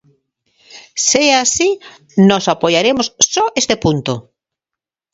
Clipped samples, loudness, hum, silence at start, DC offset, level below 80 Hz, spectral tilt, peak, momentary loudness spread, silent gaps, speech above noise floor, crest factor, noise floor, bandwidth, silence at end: under 0.1%; -13 LUFS; none; 0.75 s; under 0.1%; -48 dBFS; -3 dB/octave; 0 dBFS; 11 LU; none; 71 dB; 16 dB; -85 dBFS; 8 kHz; 0.9 s